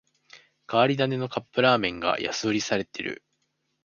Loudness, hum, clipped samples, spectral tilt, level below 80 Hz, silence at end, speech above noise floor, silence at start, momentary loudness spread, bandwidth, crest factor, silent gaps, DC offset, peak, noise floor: -25 LUFS; none; under 0.1%; -4.5 dB/octave; -62 dBFS; 0.7 s; 50 dB; 0.35 s; 11 LU; 7.2 kHz; 22 dB; none; under 0.1%; -6 dBFS; -75 dBFS